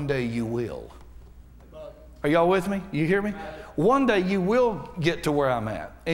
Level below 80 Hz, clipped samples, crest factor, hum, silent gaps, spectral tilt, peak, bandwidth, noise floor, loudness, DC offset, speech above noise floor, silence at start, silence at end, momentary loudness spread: -48 dBFS; under 0.1%; 18 dB; none; none; -6.5 dB/octave; -8 dBFS; 16 kHz; -47 dBFS; -25 LUFS; under 0.1%; 23 dB; 0 s; 0 s; 19 LU